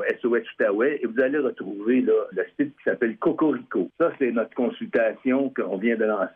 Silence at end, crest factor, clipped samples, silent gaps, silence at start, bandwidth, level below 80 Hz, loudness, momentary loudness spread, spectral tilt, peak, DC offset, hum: 0.05 s; 14 dB; under 0.1%; none; 0 s; 4 kHz; -70 dBFS; -24 LUFS; 5 LU; -9 dB/octave; -10 dBFS; under 0.1%; none